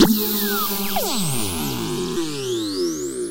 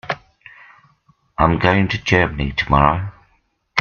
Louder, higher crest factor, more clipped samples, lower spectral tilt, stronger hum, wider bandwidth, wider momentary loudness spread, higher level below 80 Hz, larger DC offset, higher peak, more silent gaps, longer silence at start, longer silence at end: second, -22 LUFS vs -17 LUFS; about the same, 20 dB vs 20 dB; neither; second, -4 dB/octave vs -6.5 dB/octave; neither; first, 16 kHz vs 7 kHz; second, 6 LU vs 13 LU; second, -44 dBFS vs -34 dBFS; neither; about the same, 0 dBFS vs 0 dBFS; neither; about the same, 0 s vs 0.05 s; about the same, 0 s vs 0 s